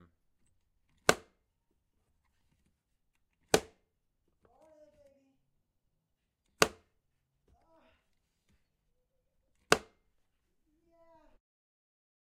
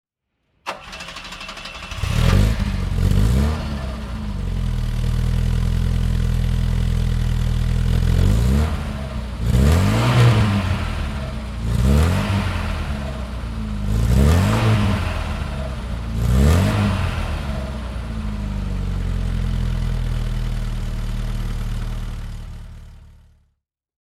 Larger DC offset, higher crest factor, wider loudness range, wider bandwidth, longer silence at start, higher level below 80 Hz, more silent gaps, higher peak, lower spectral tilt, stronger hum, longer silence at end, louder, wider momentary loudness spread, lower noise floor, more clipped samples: neither; first, 36 dB vs 18 dB; second, 2 LU vs 7 LU; second, 13.5 kHz vs 15 kHz; first, 1.1 s vs 0.65 s; second, -68 dBFS vs -24 dBFS; neither; about the same, -4 dBFS vs -2 dBFS; second, -2.5 dB/octave vs -6.5 dB/octave; neither; first, 2.6 s vs 0.95 s; second, -32 LUFS vs -21 LUFS; second, 1 LU vs 13 LU; first, -83 dBFS vs -72 dBFS; neither